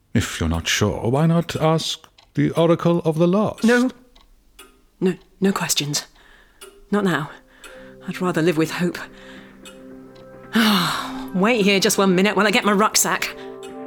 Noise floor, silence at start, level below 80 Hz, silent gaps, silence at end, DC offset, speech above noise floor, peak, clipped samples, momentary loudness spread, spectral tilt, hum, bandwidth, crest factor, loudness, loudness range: -52 dBFS; 0.15 s; -46 dBFS; none; 0 s; under 0.1%; 33 dB; -4 dBFS; under 0.1%; 14 LU; -4.5 dB/octave; none; 20 kHz; 18 dB; -19 LUFS; 7 LU